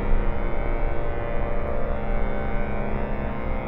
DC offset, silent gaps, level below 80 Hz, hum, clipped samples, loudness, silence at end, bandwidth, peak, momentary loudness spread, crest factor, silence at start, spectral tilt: under 0.1%; none; -24 dBFS; none; under 0.1%; -29 LUFS; 0 s; 3.8 kHz; -10 dBFS; 1 LU; 12 dB; 0 s; -10 dB/octave